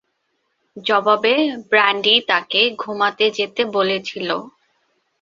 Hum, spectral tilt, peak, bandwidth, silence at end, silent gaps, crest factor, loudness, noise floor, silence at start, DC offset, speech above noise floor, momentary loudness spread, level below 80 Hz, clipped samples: none; -3.5 dB/octave; 0 dBFS; 7.6 kHz; 0.75 s; none; 18 dB; -17 LUFS; -70 dBFS; 0.75 s; under 0.1%; 52 dB; 10 LU; -68 dBFS; under 0.1%